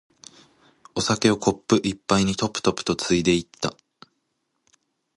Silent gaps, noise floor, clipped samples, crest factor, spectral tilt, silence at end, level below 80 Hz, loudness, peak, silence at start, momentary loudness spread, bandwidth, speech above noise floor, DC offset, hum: none; -75 dBFS; under 0.1%; 22 dB; -4.5 dB/octave; 1.45 s; -50 dBFS; -23 LUFS; -4 dBFS; 0.95 s; 10 LU; 11.5 kHz; 53 dB; under 0.1%; none